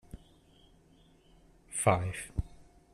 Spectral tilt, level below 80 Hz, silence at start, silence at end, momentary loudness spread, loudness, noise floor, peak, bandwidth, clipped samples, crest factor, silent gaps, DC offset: -5 dB/octave; -48 dBFS; 0.15 s; 0.3 s; 25 LU; -32 LUFS; -63 dBFS; -10 dBFS; 13.5 kHz; under 0.1%; 26 dB; none; under 0.1%